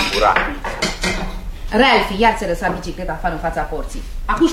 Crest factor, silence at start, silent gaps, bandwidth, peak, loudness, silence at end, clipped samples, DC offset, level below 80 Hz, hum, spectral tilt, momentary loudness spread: 18 dB; 0 s; none; 16 kHz; 0 dBFS; -18 LUFS; 0 s; under 0.1%; under 0.1%; -28 dBFS; none; -4 dB/octave; 15 LU